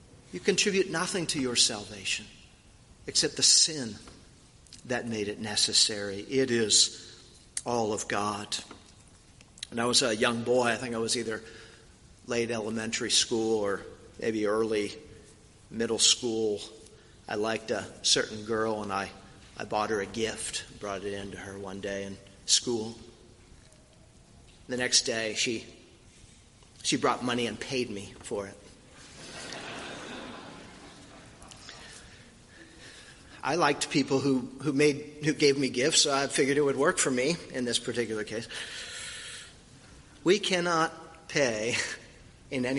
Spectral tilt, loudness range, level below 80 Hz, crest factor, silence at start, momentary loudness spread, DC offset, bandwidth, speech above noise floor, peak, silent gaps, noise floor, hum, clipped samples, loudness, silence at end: -2.5 dB/octave; 9 LU; -60 dBFS; 24 dB; 0.15 s; 21 LU; under 0.1%; 11.5 kHz; 28 dB; -8 dBFS; none; -56 dBFS; none; under 0.1%; -28 LUFS; 0 s